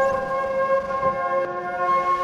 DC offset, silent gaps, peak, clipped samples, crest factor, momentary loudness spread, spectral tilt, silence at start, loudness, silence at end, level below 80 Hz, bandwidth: under 0.1%; none; -10 dBFS; under 0.1%; 12 dB; 4 LU; -5.5 dB/octave; 0 s; -23 LUFS; 0 s; -52 dBFS; 11 kHz